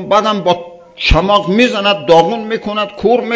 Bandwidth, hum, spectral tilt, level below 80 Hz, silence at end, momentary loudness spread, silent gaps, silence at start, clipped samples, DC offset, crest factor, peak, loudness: 8 kHz; none; -5.5 dB/octave; -26 dBFS; 0 s; 8 LU; none; 0 s; 0.7%; under 0.1%; 12 dB; 0 dBFS; -13 LUFS